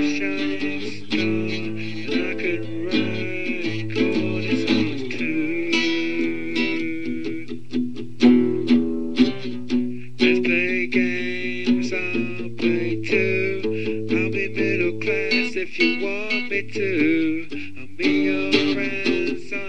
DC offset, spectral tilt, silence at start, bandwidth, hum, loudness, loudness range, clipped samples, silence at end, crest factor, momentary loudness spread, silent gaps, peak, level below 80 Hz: 3%; -5.5 dB/octave; 0 s; 9.2 kHz; none; -22 LUFS; 4 LU; under 0.1%; 0 s; 18 dB; 8 LU; none; -4 dBFS; -64 dBFS